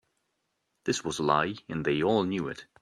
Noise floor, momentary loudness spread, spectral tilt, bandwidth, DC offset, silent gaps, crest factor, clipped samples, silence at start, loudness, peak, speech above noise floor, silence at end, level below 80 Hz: -79 dBFS; 8 LU; -5 dB/octave; 13 kHz; under 0.1%; none; 22 dB; under 0.1%; 0.85 s; -29 LUFS; -8 dBFS; 50 dB; 0.2 s; -62 dBFS